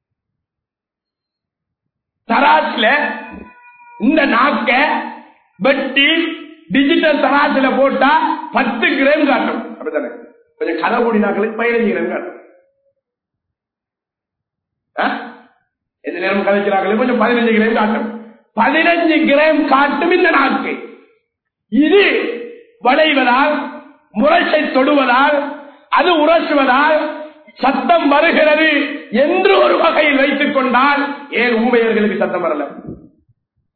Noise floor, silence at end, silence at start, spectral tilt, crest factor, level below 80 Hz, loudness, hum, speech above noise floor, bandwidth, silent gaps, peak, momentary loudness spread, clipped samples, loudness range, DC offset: -85 dBFS; 0.8 s; 2.3 s; -8 dB/octave; 14 dB; -54 dBFS; -13 LUFS; none; 72 dB; 4.6 kHz; none; -2 dBFS; 13 LU; under 0.1%; 7 LU; under 0.1%